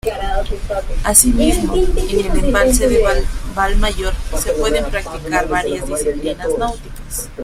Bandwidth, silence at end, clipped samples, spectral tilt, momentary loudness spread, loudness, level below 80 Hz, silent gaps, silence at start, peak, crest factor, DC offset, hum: 16 kHz; 0 s; under 0.1%; -3.5 dB/octave; 11 LU; -17 LUFS; -20 dBFS; none; 0.05 s; 0 dBFS; 16 dB; under 0.1%; none